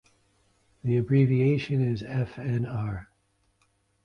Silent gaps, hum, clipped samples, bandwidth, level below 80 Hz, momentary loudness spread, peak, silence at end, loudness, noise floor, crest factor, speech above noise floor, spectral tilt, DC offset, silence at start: none; none; under 0.1%; 6.4 kHz; -54 dBFS; 12 LU; -10 dBFS; 1 s; -27 LUFS; -70 dBFS; 18 dB; 45 dB; -9.5 dB/octave; under 0.1%; 0.85 s